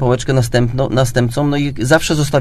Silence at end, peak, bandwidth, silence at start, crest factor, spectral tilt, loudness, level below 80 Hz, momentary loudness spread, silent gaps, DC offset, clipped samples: 0 s; 0 dBFS; 14 kHz; 0 s; 14 dB; -5.5 dB/octave; -15 LUFS; -34 dBFS; 3 LU; none; under 0.1%; under 0.1%